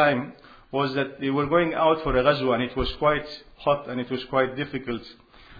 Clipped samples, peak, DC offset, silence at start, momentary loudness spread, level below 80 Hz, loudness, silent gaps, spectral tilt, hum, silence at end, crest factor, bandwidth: under 0.1%; -6 dBFS; under 0.1%; 0 s; 10 LU; -44 dBFS; -25 LUFS; none; -8 dB/octave; none; 0 s; 18 dB; 5 kHz